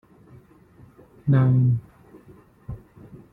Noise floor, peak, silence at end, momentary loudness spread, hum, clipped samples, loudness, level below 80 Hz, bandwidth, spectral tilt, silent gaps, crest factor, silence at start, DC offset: -52 dBFS; -8 dBFS; 0.15 s; 23 LU; none; under 0.1%; -21 LUFS; -52 dBFS; 3.7 kHz; -11.5 dB/octave; none; 18 dB; 1.25 s; under 0.1%